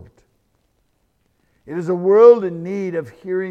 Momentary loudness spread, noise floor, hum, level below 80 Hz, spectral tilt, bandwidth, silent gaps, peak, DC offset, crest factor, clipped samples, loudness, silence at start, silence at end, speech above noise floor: 17 LU; -65 dBFS; none; -64 dBFS; -8.5 dB/octave; 6.4 kHz; none; 0 dBFS; under 0.1%; 18 dB; under 0.1%; -16 LUFS; 1.65 s; 0 s; 49 dB